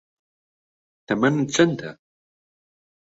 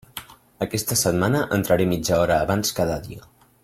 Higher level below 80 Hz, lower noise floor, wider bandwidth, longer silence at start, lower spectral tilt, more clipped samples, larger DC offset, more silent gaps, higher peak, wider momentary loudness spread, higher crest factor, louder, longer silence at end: second, -64 dBFS vs -46 dBFS; first, under -90 dBFS vs -41 dBFS; second, 8 kHz vs 16.5 kHz; first, 1.1 s vs 0.15 s; about the same, -5 dB/octave vs -4.5 dB/octave; neither; neither; neither; about the same, -4 dBFS vs -6 dBFS; second, 13 LU vs 18 LU; about the same, 22 dB vs 18 dB; about the same, -21 LUFS vs -22 LUFS; first, 1.25 s vs 0.45 s